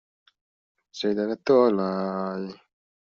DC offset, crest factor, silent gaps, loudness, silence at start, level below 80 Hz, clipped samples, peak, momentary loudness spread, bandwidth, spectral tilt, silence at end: under 0.1%; 20 dB; none; -24 LUFS; 0.95 s; -70 dBFS; under 0.1%; -8 dBFS; 16 LU; 7.2 kHz; -5.5 dB/octave; 0.45 s